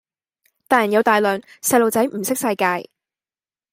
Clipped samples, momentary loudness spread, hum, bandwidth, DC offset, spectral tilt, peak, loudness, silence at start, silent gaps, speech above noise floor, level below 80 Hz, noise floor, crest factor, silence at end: under 0.1%; 6 LU; none; 16.5 kHz; under 0.1%; -3.5 dB/octave; -2 dBFS; -18 LUFS; 0.7 s; none; over 72 dB; -66 dBFS; under -90 dBFS; 18 dB; 0.9 s